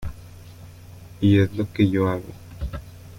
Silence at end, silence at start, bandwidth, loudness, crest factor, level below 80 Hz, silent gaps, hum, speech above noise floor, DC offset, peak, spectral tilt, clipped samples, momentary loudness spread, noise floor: 0 s; 0 s; 16 kHz; -22 LUFS; 16 dB; -42 dBFS; none; none; 23 dB; under 0.1%; -6 dBFS; -8 dB/octave; under 0.1%; 25 LU; -43 dBFS